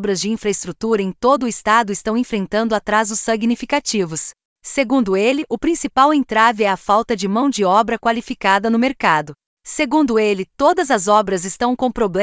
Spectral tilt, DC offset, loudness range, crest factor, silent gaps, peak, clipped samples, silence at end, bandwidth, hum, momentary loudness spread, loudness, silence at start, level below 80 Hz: -4 dB/octave; under 0.1%; 3 LU; 16 dB; 4.45-4.56 s, 9.46-9.57 s; 0 dBFS; under 0.1%; 0 s; 8 kHz; none; 7 LU; -17 LUFS; 0 s; -50 dBFS